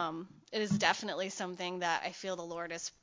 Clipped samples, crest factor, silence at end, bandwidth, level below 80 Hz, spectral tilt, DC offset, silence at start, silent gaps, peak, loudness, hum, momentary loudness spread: under 0.1%; 26 dB; 0.1 s; 7.6 kHz; -74 dBFS; -3.5 dB/octave; under 0.1%; 0 s; none; -12 dBFS; -35 LUFS; none; 10 LU